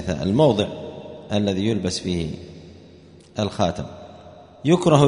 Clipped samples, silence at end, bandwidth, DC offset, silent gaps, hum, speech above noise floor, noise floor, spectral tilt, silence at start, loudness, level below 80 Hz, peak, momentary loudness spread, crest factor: under 0.1%; 0 s; 10.5 kHz; under 0.1%; none; none; 27 dB; -47 dBFS; -6.5 dB/octave; 0 s; -22 LUFS; -48 dBFS; -2 dBFS; 20 LU; 20 dB